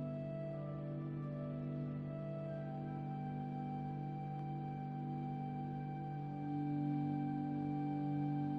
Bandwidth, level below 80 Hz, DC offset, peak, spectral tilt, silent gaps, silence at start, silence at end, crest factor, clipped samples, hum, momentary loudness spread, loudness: 5 kHz; -68 dBFS; under 0.1%; -30 dBFS; -11 dB/octave; none; 0 s; 0 s; 12 dB; under 0.1%; none; 5 LU; -42 LUFS